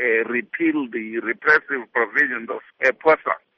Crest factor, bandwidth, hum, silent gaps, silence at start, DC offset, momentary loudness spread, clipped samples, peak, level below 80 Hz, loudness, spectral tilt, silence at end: 18 dB; 7 kHz; none; none; 0 s; under 0.1%; 9 LU; under 0.1%; -2 dBFS; -68 dBFS; -20 LUFS; -2 dB/octave; 0.2 s